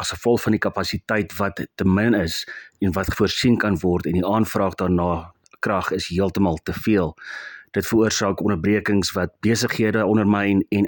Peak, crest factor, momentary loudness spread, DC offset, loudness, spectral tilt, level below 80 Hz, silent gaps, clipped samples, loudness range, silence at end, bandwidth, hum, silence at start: -4 dBFS; 18 dB; 7 LU; under 0.1%; -21 LUFS; -5.5 dB/octave; -46 dBFS; none; under 0.1%; 2 LU; 0 s; 17.5 kHz; none; 0 s